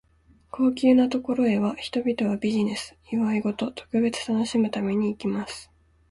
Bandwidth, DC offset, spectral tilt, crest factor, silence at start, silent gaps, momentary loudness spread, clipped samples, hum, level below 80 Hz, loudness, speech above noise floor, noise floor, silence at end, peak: 11.5 kHz; under 0.1%; -6 dB/octave; 16 dB; 0.55 s; none; 11 LU; under 0.1%; none; -58 dBFS; -25 LUFS; 35 dB; -59 dBFS; 0.45 s; -8 dBFS